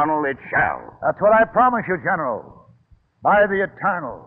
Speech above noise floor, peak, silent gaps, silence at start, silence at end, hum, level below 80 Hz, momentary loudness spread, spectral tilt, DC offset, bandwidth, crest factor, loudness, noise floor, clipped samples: 36 dB; -6 dBFS; none; 0 s; 0.05 s; none; -52 dBFS; 9 LU; -10 dB/octave; under 0.1%; 3.7 kHz; 14 dB; -19 LUFS; -56 dBFS; under 0.1%